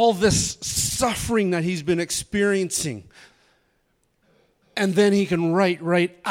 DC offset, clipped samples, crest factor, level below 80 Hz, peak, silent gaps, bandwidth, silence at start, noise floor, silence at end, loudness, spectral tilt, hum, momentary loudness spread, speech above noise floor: under 0.1%; under 0.1%; 16 dB; -46 dBFS; -6 dBFS; none; 17 kHz; 0 s; -68 dBFS; 0 s; -22 LUFS; -4 dB/octave; none; 6 LU; 47 dB